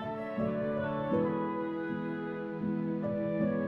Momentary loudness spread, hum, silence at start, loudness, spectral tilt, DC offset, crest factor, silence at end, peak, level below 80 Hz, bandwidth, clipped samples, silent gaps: 6 LU; none; 0 s; -34 LUFS; -10 dB/octave; under 0.1%; 14 dB; 0 s; -18 dBFS; -64 dBFS; 5.2 kHz; under 0.1%; none